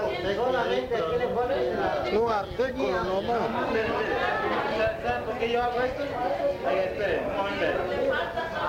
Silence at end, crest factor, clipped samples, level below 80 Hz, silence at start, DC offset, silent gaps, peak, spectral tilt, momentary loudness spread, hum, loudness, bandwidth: 0 s; 14 dB; under 0.1%; -48 dBFS; 0 s; under 0.1%; none; -12 dBFS; -5.5 dB/octave; 3 LU; none; -27 LUFS; 16 kHz